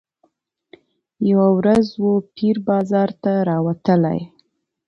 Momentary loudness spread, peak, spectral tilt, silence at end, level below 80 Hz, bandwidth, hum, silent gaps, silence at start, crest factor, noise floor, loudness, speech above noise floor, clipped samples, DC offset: 7 LU; -4 dBFS; -9 dB/octave; 0.6 s; -56 dBFS; 7.4 kHz; none; none; 1.2 s; 14 dB; -65 dBFS; -18 LUFS; 48 dB; under 0.1%; under 0.1%